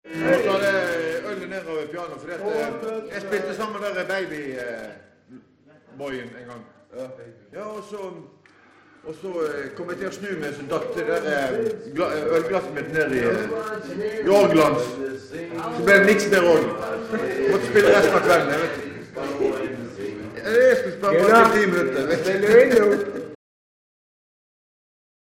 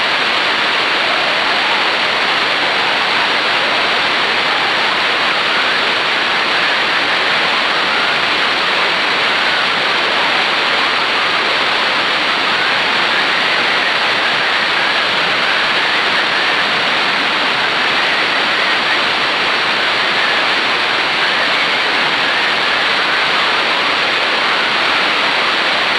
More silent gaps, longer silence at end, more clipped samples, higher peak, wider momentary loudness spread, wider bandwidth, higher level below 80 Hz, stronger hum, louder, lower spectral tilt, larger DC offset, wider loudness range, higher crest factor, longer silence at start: neither; first, 1.95 s vs 0 s; neither; about the same, 0 dBFS vs 0 dBFS; first, 19 LU vs 1 LU; first, 16.5 kHz vs 11 kHz; about the same, -58 dBFS vs -54 dBFS; neither; second, -21 LUFS vs -12 LUFS; first, -5 dB/octave vs -1.5 dB/octave; neither; first, 17 LU vs 0 LU; first, 22 dB vs 14 dB; about the same, 0.05 s vs 0 s